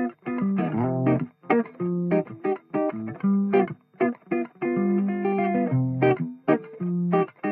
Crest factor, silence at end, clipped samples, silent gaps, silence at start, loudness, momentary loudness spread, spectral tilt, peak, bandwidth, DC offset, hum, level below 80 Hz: 18 dB; 0 s; under 0.1%; none; 0 s; -25 LUFS; 6 LU; -12.5 dB/octave; -6 dBFS; 3.7 kHz; under 0.1%; none; -68 dBFS